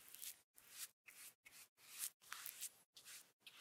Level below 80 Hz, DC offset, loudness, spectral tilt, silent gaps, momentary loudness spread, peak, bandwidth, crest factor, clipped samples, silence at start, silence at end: under -90 dBFS; under 0.1%; -54 LUFS; 2.5 dB/octave; 0.44-0.54 s, 0.93-1.04 s, 1.35-1.43 s, 1.69-1.76 s, 2.14-2.20 s, 2.86-2.93 s, 3.33-3.40 s; 13 LU; -22 dBFS; 18 kHz; 34 dB; under 0.1%; 0 s; 0 s